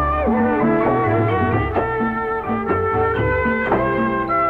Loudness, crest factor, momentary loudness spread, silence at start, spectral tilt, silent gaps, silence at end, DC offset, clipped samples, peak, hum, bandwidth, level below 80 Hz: -19 LUFS; 14 dB; 4 LU; 0 s; -9.5 dB/octave; none; 0 s; under 0.1%; under 0.1%; -4 dBFS; none; 4.9 kHz; -34 dBFS